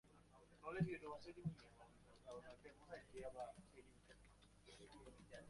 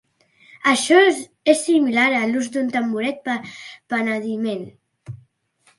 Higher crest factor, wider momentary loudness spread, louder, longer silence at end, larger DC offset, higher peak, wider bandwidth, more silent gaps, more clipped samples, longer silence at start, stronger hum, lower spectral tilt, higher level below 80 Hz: first, 24 dB vs 18 dB; about the same, 21 LU vs 22 LU; second, -54 LUFS vs -19 LUFS; second, 0 s vs 0.65 s; neither; second, -32 dBFS vs -2 dBFS; about the same, 11.5 kHz vs 11.5 kHz; neither; neither; second, 0.05 s vs 0.65 s; neither; first, -7 dB/octave vs -3.5 dB/octave; about the same, -72 dBFS vs -68 dBFS